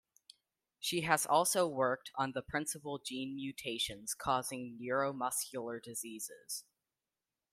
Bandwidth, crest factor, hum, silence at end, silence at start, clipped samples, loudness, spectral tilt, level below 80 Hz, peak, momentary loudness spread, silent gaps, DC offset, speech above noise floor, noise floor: 16 kHz; 24 dB; none; 0.9 s; 0.8 s; under 0.1%; -36 LUFS; -2.5 dB/octave; -70 dBFS; -14 dBFS; 13 LU; none; under 0.1%; over 53 dB; under -90 dBFS